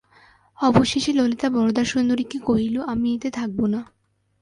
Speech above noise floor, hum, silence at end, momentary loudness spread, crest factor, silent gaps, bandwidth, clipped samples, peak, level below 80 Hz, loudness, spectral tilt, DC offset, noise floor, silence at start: 34 dB; none; 0.55 s; 6 LU; 20 dB; none; 11 kHz; under 0.1%; -2 dBFS; -50 dBFS; -22 LUFS; -5.5 dB/octave; under 0.1%; -55 dBFS; 0.6 s